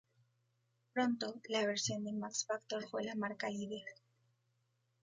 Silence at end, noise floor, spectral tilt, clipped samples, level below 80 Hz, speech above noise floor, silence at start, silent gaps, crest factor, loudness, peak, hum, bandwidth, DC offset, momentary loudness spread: 1.1 s; -80 dBFS; -3 dB/octave; under 0.1%; -80 dBFS; 41 dB; 0.95 s; none; 20 dB; -39 LUFS; -22 dBFS; none; 9.4 kHz; under 0.1%; 7 LU